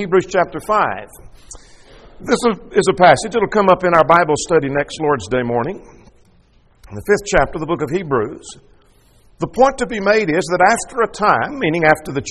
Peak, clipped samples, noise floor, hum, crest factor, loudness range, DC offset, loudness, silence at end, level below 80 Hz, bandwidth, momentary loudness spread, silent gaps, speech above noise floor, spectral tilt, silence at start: 0 dBFS; under 0.1%; -52 dBFS; none; 16 dB; 7 LU; under 0.1%; -16 LUFS; 0 s; -40 dBFS; 13 kHz; 14 LU; none; 36 dB; -5 dB/octave; 0 s